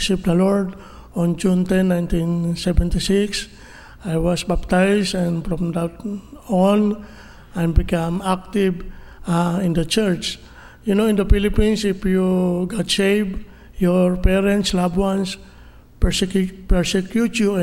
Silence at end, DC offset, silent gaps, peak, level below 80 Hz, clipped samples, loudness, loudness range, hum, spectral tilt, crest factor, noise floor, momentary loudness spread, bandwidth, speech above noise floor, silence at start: 0 s; under 0.1%; none; 0 dBFS; -28 dBFS; under 0.1%; -20 LUFS; 2 LU; none; -6 dB/octave; 18 dB; -44 dBFS; 11 LU; 15.5 kHz; 25 dB; 0 s